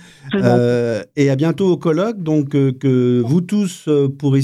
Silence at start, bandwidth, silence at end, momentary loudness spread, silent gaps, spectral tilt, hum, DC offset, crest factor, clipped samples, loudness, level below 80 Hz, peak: 0.25 s; 12.5 kHz; 0 s; 4 LU; none; -7.5 dB/octave; none; under 0.1%; 16 dB; under 0.1%; -16 LUFS; -58 dBFS; 0 dBFS